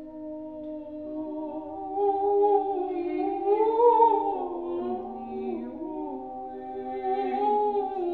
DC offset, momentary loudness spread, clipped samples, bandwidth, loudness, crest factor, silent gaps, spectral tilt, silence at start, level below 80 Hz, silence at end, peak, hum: 0.1%; 17 LU; under 0.1%; 4.4 kHz; -27 LUFS; 18 dB; none; -9 dB/octave; 0 s; -64 dBFS; 0 s; -8 dBFS; none